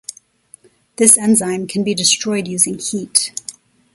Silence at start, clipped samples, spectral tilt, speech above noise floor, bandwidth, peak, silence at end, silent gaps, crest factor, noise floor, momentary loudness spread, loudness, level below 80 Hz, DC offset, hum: 0.1 s; under 0.1%; -2.5 dB/octave; 32 dB; 16 kHz; 0 dBFS; 0.45 s; none; 18 dB; -48 dBFS; 15 LU; -14 LUFS; -60 dBFS; under 0.1%; none